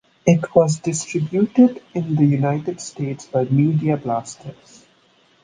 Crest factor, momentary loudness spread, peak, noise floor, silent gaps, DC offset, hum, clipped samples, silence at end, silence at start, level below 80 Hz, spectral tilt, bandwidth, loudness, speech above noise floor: 18 dB; 12 LU; -2 dBFS; -57 dBFS; none; under 0.1%; none; under 0.1%; 0.9 s; 0.25 s; -58 dBFS; -7 dB/octave; 9.8 kHz; -19 LUFS; 38 dB